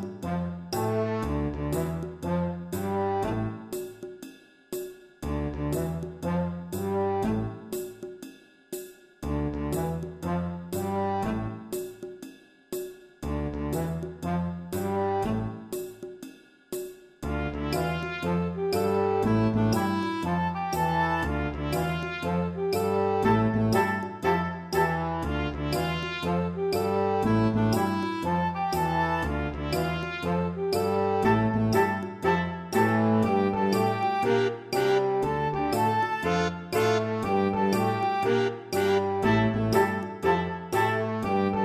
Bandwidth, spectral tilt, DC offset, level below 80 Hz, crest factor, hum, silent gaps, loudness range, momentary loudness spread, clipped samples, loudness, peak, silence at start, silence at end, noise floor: 15.5 kHz; -6.5 dB/octave; under 0.1%; -44 dBFS; 18 dB; none; none; 8 LU; 13 LU; under 0.1%; -27 LUFS; -10 dBFS; 0 s; 0 s; -48 dBFS